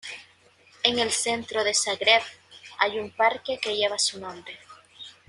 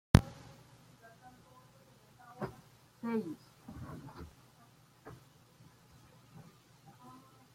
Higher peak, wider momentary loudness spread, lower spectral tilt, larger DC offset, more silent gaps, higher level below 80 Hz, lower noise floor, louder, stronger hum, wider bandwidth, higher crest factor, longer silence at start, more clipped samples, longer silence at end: about the same, -2 dBFS vs -4 dBFS; about the same, 22 LU vs 23 LU; second, -0.5 dB/octave vs -6.5 dB/octave; neither; neither; second, -70 dBFS vs -48 dBFS; second, -58 dBFS vs -63 dBFS; first, -24 LUFS vs -38 LUFS; neither; second, 12 kHz vs 16 kHz; second, 24 dB vs 36 dB; about the same, 0.05 s vs 0.15 s; neither; second, 0.2 s vs 2.4 s